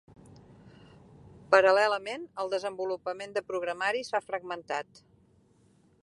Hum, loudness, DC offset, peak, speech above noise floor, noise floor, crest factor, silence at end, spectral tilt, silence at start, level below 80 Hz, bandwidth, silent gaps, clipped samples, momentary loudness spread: none; -29 LUFS; under 0.1%; -6 dBFS; 35 dB; -64 dBFS; 26 dB; 1.2 s; -3.5 dB/octave; 0.65 s; -70 dBFS; 11.5 kHz; none; under 0.1%; 14 LU